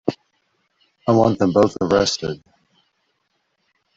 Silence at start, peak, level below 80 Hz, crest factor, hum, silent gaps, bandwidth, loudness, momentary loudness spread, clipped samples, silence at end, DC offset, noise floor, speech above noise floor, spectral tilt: 0.05 s; -2 dBFS; -52 dBFS; 20 dB; none; none; 7.8 kHz; -18 LUFS; 14 LU; under 0.1%; 1.6 s; under 0.1%; -70 dBFS; 53 dB; -5.5 dB/octave